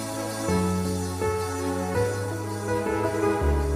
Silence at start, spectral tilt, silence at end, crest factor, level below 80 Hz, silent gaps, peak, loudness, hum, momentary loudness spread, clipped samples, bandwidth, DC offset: 0 s; -6 dB/octave; 0 s; 14 dB; -36 dBFS; none; -12 dBFS; -27 LUFS; none; 5 LU; under 0.1%; 16 kHz; under 0.1%